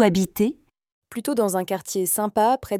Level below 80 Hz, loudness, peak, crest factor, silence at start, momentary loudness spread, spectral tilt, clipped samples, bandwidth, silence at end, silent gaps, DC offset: -56 dBFS; -23 LUFS; -4 dBFS; 18 dB; 0 s; 10 LU; -5 dB/octave; under 0.1%; 17 kHz; 0 s; 0.92-1.02 s; under 0.1%